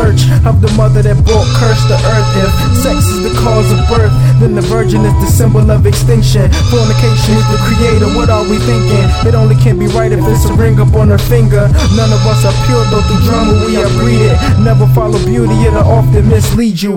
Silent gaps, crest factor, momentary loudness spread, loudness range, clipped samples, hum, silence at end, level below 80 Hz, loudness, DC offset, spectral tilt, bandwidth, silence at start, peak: none; 8 dB; 3 LU; 1 LU; 0.4%; none; 0 s; -18 dBFS; -9 LUFS; under 0.1%; -6.5 dB/octave; 17 kHz; 0 s; 0 dBFS